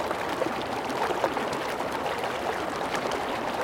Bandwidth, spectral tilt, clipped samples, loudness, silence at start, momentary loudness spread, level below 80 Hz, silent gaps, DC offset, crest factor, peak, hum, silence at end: 17 kHz; -4 dB/octave; under 0.1%; -29 LUFS; 0 s; 3 LU; -56 dBFS; none; under 0.1%; 20 dB; -8 dBFS; none; 0 s